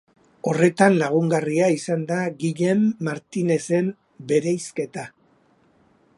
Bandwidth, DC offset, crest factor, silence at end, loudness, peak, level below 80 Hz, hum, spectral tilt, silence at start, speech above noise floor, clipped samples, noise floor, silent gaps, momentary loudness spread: 11.5 kHz; under 0.1%; 20 dB; 1.1 s; -22 LUFS; -2 dBFS; -68 dBFS; none; -6.5 dB/octave; 0.45 s; 39 dB; under 0.1%; -60 dBFS; none; 12 LU